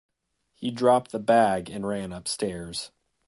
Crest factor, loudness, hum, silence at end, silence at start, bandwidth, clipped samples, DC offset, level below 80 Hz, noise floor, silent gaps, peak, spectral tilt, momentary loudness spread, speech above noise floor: 18 dB; -26 LUFS; none; 0.4 s; 0.6 s; 11.5 kHz; under 0.1%; under 0.1%; -58 dBFS; -73 dBFS; none; -8 dBFS; -4.5 dB/octave; 13 LU; 48 dB